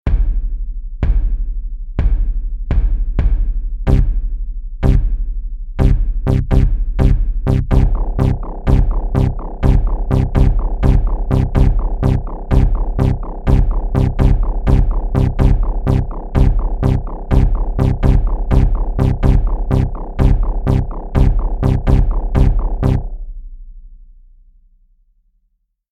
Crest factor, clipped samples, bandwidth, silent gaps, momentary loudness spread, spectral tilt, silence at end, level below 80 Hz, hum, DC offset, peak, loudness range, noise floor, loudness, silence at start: 12 dB; under 0.1%; 4.8 kHz; none; 8 LU; -9.5 dB/octave; 1.8 s; -16 dBFS; none; under 0.1%; 0 dBFS; 4 LU; -64 dBFS; -17 LUFS; 0.05 s